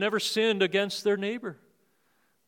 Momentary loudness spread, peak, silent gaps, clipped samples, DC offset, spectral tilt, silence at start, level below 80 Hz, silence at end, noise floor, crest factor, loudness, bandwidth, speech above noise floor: 11 LU; -12 dBFS; none; under 0.1%; under 0.1%; -3.5 dB/octave; 0 s; -86 dBFS; 0.95 s; -71 dBFS; 18 dB; -27 LUFS; 17 kHz; 44 dB